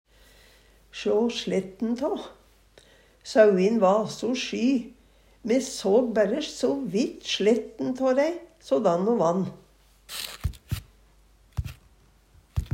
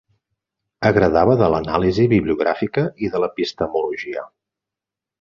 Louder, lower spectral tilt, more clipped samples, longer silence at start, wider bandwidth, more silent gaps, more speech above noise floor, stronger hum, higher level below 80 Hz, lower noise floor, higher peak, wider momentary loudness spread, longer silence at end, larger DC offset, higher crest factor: second, -25 LUFS vs -19 LUFS; second, -5.5 dB/octave vs -8 dB/octave; neither; first, 0.95 s vs 0.8 s; first, 16 kHz vs 7.4 kHz; neither; second, 34 dB vs 69 dB; neither; about the same, -46 dBFS vs -42 dBFS; second, -58 dBFS vs -87 dBFS; second, -6 dBFS vs -2 dBFS; first, 15 LU vs 9 LU; second, 0.05 s vs 0.95 s; neither; about the same, 20 dB vs 18 dB